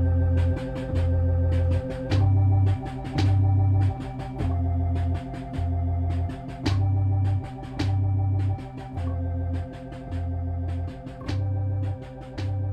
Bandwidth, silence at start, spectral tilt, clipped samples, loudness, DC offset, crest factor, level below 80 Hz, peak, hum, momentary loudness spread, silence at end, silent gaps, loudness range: 6.6 kHz; 0 s; -8.5 dB/octave; under 0.1%; -26 LUFS; under 0.1%; 14 dB; -36 dBFS; -10 dBFS; none; 12 LU; 0 s; none; 7 LU